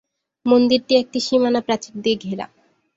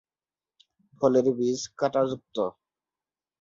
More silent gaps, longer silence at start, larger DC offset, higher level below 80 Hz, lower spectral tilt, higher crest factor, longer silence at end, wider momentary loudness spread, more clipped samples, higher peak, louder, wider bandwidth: neither; second, 0.45 s vs 1 s; neither; first, -62 dBFS vs -68 dBFS; about the same, -4.5 dB/octave vs -5.5 dB/octave; about the same, 18 dB vs 20 dB; second, 0.5 s vs 0.9 s; first, 13 LU vs 9 LU; neither; first, -2 dBFS vs -8 dBFS; first, -19 LUFS vs -26 LUFS; about the same, 7.8 kHz vs 7.6 kHz